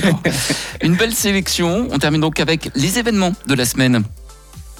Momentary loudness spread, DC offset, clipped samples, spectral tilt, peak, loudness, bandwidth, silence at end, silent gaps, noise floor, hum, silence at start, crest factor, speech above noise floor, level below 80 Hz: 4 LU; under 0.1%; under 0.1%; -4 dB/octave; -4 dBFS; -16 LUFS; 19 kHz; 0 s; none; -37 dBFS; none; 0 s; 14 dB; 20 dB; -38 dBFS